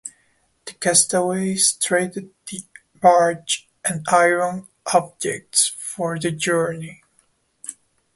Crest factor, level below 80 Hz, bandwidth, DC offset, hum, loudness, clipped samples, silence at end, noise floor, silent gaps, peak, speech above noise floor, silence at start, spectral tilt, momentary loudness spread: 20 dB; -64 dBFS; 12 kHz; under 0.1%; none; -19 LUFS; under 0.1%; 0.45 s; -63 dBFS; none; -2 dBFS; 43 dB; 0.05 s; -2.5 dB/octave; 20 LU